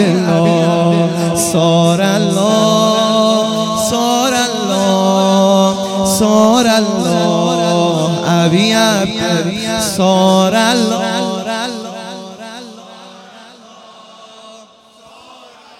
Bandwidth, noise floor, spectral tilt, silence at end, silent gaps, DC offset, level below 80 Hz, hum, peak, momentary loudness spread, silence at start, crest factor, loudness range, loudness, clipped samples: 16.5 kHz; -43 dBFS; -4.5 dB/octave; 0.45 s; none; under 0.1%; -48 dBFS; none; 0 dBFS; 9 LU; 0 s; 14 dB; 9 LU; -12 LUFS; under 0.1%